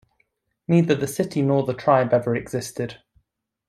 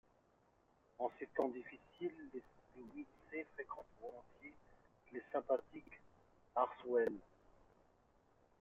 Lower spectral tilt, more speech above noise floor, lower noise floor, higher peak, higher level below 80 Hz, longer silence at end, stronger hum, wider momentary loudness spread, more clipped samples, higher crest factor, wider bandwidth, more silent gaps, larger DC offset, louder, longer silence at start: first, -6.5 dB/octave vs -4.5 dB/octave; first, 53 dB vs 31 dB; about the same, -74 dBFS vs -75 dBFS; first, -4 dBFS vs -22 dBFS; first, -60 dBFS vs -78 dBFS; second, 0.7 s vs 1.35 s; neither; second, 12 LU vs 21 LU; neither; about the same, 20 dB vs 24 dB; first, 14.5 kHz vs 7 kHz; neither; neither; first, -22 LUFS vs -44 LUFS; second, 0.7 s vs 1 s